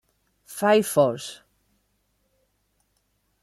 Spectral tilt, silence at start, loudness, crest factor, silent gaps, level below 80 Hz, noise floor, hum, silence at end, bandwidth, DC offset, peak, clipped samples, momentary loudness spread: -4.5 dB/octave; 0.5 s; -22 LUFS; 22 dB; none; -70 dBFS; -71 dBFS; 50 Hz at -60 dBFS; 2.1 s; 16 kHz; under 0.1%; -6 dBFS; under 0.1%; 19 LU